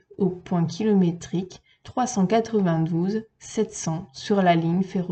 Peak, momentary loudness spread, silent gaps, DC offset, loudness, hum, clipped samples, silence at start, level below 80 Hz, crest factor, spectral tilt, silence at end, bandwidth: -6 dBFS; 11 LU; none; under 0.1%; -24 LUFS; none; under 0.1%; 0.2 s; -60 dBFS; 18 dB; -6.5 dB/octave; 0 s; 8.8 kHz